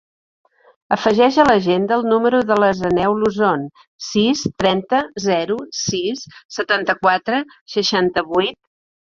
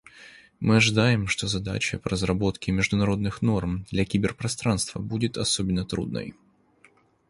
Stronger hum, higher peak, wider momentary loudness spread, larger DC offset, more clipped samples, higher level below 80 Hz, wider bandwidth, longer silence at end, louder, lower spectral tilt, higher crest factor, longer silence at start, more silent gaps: neither; first, 0 dBFS vs -6 dBFS; about the same, 10 LU vs 9 LU; neither; neither; second, -52 dBFS vs -44 dBFS; second, 7.6 kHz vs 11.5 kHz; second, 0.55 s vs 1 s; first, -17 LUFS vs -25 LUFS; about the same, -4.5 dB/octave vs -5 dB/octave; about the same, 18 dB vs 20 dB; first, 0.9 s vs 0.15 s; first, 3.87-3.99 s, 6.45-6.49 s, 7.61-7.66 s vs none